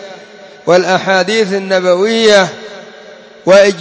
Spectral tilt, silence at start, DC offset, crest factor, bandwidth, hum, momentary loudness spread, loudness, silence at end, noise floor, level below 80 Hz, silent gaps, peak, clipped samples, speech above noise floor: -4 dB/octave; 0 s; under 0.1%; 12 dB; 8 kHz; none; 21 LU; -10 LUFS; 0 s; -35 dBFS; -58 dBFS; none; 0 dBFS; 0.2%; 26 dB